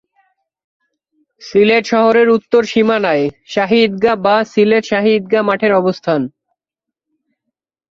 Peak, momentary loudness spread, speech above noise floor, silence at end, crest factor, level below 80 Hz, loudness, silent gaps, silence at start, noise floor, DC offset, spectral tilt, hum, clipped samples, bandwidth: 0 dBFS; 6 LU; 71 dB; 1.65 s; 14 dB; -56 dBFS; -13 LUFS; none; 1.4 s; -83 dBFS; under 0.1%; -5.5 dB/octave; none; under 0.1%; 7.4 kHz